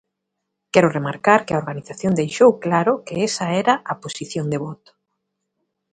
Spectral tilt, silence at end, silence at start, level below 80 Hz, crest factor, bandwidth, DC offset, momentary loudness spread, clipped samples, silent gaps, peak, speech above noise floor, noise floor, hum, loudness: -5.5 dB/octave; 1.2 s; 0.75 s; -60 dBFS; 20 dB; 9.4 kHz; under 0.1%; 12 LU; under 0.1%; none; 0 dBFS; 59 dB; -79 dBFS; none; -19 LUFS